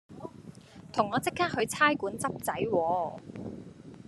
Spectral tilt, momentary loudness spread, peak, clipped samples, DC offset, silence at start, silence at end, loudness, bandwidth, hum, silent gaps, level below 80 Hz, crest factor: -4 dB/octave; 21 LU; -10 dBFS; under 0.1%; under 0.1%; 0.1 s; 0.05 s; -29 LUFS; 13 kHz; none; none; -66 dBFS; 22 dB